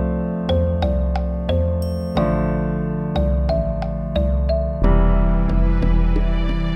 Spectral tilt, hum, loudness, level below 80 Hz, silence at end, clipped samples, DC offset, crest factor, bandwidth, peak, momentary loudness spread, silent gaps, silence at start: -9 dB/octave; none; -21 LUFS; -20 dBFS; 0 s; under 0.1%; under 0.1%; 16 dB; 9 kHz; -2 dBFS; 4 LU; none; 0 s